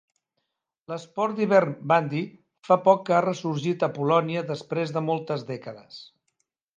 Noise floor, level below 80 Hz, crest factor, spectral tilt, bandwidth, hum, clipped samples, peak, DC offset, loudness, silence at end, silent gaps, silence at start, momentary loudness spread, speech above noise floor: -80 dBFS; -74 dBFS; 22 dB; -7 dB/octave; 9 kHz; none; under 0.1%; -4 dBFS; under 0.1%; -24 LUFS; 0.7 s; none; 0.9 s; 16 LU; 56 dB